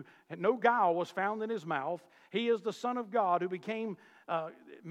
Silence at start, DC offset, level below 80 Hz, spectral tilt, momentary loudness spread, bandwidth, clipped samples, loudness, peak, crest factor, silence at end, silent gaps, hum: 0 s; under 0.1%; under -90 dBFS; -6 dB/octave; 14 LU; 12 kHz; under 0.1%; -33 LUFS; -14 dBFS; 20 dB; 0 s; none; none